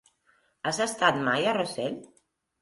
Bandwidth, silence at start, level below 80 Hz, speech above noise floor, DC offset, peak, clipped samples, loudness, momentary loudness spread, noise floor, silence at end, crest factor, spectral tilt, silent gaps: 11.5 kHz; 0.65 s; -68 dBFS; 41 dB; under 0.1%; -8 dBFS; under 0.1%; -27 LUFS; 10 LU; -68 dBFS; 0.55 s; 20 dB; -3.5 dB/octave; none